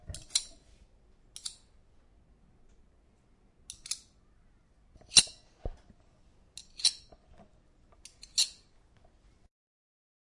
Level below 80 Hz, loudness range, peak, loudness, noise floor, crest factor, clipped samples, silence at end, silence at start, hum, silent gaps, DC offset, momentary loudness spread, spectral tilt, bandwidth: -56 dBFS; 17 LU; -4 dBFS; -29 LUFS; -65 dBFS; 34 dB; under 0.1%; 1.85 s; 0.1 s; none; none; under 0.1%; 27 LU; 1 dB/octave; 11.5 kHz